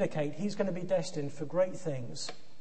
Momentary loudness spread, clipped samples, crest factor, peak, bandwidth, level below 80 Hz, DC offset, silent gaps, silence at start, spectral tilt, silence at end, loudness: 8 LU; under 0.1%; 18 dB; -16 dBFS; 8.8 kHz; -68 dBFS; 1%; none; 0 s; -5.5 dB/octave; 0.2 s; -35 LUFS